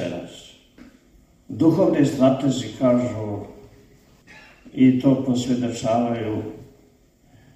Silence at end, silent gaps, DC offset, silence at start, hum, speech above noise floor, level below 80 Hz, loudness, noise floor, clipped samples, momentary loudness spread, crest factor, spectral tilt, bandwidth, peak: 0.9 s; none; under 0.1%; 0 s; none; 36 dB; -56 dBFS; -21 LUFS; -56 dBFS; under 0.1%; 19 LU; 18 dB; -7 dB/octave; 12.5 kHz; -4 dBFS